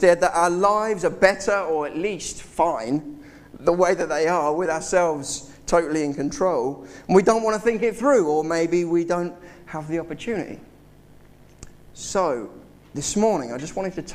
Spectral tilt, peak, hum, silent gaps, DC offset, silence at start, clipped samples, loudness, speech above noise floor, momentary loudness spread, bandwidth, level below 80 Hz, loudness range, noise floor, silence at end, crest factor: -4.5 dB/octave; -2 dBFS; none; none; under 0.1%; 0 s; under 0.1%; -22 LUFS; 27 dB; 12 LU; 15 kHz; -50 dBFS; 9 LU; -49 dBFS; 0 s; 20 dB